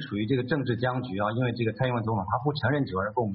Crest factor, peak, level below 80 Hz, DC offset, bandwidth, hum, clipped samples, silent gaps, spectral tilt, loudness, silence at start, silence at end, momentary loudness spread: 14 dB; -12 dBFS; -58 dBFS; under 0.1%; 5.4 kHz; none; under 0.1%; none; -6 dB/octave; -28 LUFS; 0 s; 0 s; 2 LU